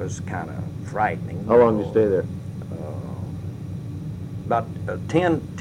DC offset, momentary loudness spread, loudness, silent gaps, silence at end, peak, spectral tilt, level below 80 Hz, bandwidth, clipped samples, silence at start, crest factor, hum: under 0.1%; 15 LU; -24 LUFS; none; 0 s; -6 dBFS; -7.5 dB/octave; -48 dBFS; 11 kHz; under 0.1%; 0 s; 18 dB; none